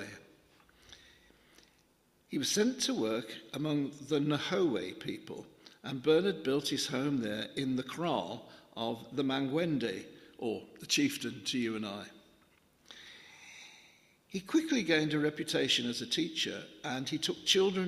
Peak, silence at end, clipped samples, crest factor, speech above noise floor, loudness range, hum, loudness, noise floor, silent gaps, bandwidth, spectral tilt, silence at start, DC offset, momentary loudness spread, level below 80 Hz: -10 dBFS; 0 s; under 0.1%; 24 dB; 36 dB; 5 LU; none; -33 LUFS; -69 dBFS; none; 15.5 kHz; -4 dB/octave; 0 s; under 0.1%; 19 LU; -74 dBFS